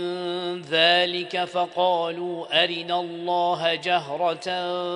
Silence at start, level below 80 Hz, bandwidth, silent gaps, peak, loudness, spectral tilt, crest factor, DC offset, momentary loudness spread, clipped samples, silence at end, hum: 0 s; -74 dBFS; 10.5 kHz; none; -6 dBFS; -23 LUFS; -4 dB/octave; 18 dB; under 0.1%; 10 LU; under 0.1%; 0 s; none